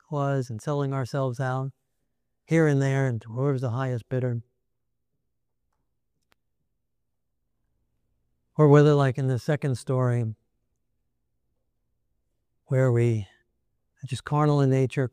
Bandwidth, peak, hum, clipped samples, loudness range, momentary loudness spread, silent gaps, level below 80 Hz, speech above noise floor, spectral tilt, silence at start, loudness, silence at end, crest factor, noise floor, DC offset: 10.5 kHz; -6 dBFS; 60 Hz at -55 dBFS; under 0.1%; 9 LU; 12 LU; none; -64 dBFS; 59 dB; -8 dB/octave; 0.1 s; -25 LUFS; 0.05 s; 22 dB; -82 dBFS; under 0.1%